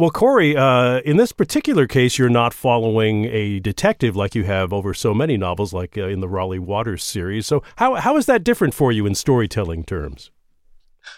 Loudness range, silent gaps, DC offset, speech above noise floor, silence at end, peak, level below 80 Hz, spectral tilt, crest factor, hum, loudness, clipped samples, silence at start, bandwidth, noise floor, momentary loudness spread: 5 LU; none; under 0.1%; 33 dB; 0.05 s; -2 dBFS; -42 dBFS; -6 dB/octave; 16 dB; none; -18 LUFS; under 0.1%; 0 s; 16.5 kHz; -51 dBFS; 10 LU